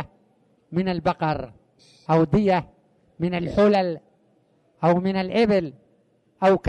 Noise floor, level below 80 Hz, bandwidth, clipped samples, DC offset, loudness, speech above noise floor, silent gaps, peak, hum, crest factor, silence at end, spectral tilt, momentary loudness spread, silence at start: -63 dBFS; -50 dBFS; 9.2 kHz; under 0.1%; under 0.1%; -22 LUFS; 42 dB; none; -8 dBFS; none; 16 dB; 0 s; -8 dB/octave; 15 LU; 0 s